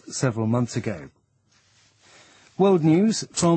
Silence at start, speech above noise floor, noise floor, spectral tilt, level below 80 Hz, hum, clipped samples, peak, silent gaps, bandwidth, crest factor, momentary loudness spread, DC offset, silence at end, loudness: 0.05 s; 43 dB; -63 dBFS; -6 dB/octave; -60 dBFS; none; under 0.1%; -8 dBFS; none; 8.8 kHz; 16 dB; 15 LU; under 0.1%; 0 s; -22 LUFS